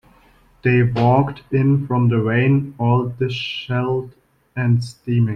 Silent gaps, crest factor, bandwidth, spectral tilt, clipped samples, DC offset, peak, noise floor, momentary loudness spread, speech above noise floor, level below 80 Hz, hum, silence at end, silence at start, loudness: none; 16 dB; 9 kHz; -8.5 dB/octave; under 0.1%; under 0.1%; -4 dBFS; -53 dBFS; 8 LU; 35 dB; -48 dBFS; none; 0 s; 0.65 s; -19 LUFS